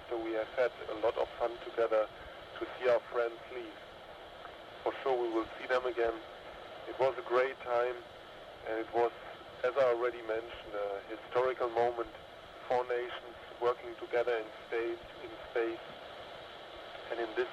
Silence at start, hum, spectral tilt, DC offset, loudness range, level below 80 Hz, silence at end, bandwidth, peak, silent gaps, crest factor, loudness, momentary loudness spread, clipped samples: 0 s; none; -5.5 dB/octave; under 0.1%; 3 LU; -66 dBFS; 0 s; 12.5 kHz; -18 dBFS; none; 18 dB; -35 LUFS; 16 LU; under 0.1%